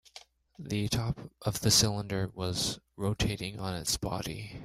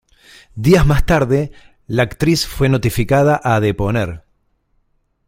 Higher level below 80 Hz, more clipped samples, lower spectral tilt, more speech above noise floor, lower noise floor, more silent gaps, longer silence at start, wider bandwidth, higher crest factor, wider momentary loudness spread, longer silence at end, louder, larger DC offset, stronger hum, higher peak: second, -50 dBFS vs -28 dBFS; neither; second, -3.5 dB/octave vs -6 dB/octave; second, 24 dB vs 48 dB; second, -55 dBFS vs -62 dBFS; neither; second, 0.15 s vs 0.55 s; about the same, 16 kHz vs 16.5 kHz; first, 22 dB vs 16 dB; about the same, 12 LU vs 10 LU; second, 0 s vs 1.1 s; second, -31 LUFS vs -16 LUFS; neither; neither; second, -10 dBFS vs 0 dBFS